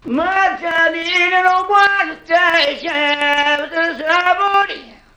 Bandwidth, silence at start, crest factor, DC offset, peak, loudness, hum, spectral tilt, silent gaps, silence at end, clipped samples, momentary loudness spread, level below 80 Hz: 19.5 kHz; 0.05 s; 14 dB; under 0.1%; 0 dBFS; -14 LUFS; none; -2 dB/octave; none; 0.3 s; under 0.1%; 5 LU; -52 dBFS